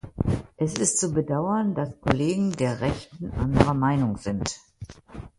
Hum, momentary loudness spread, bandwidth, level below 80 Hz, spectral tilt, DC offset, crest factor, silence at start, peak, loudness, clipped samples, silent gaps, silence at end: none; 13 LU; 11.5 kHz; -40 dBFS; -5.5 dB/octave; under 0.1%; 26 dB; 0.05 s; 0 dBFS; -25 LUFS; under 0.1%; none; 0.1 s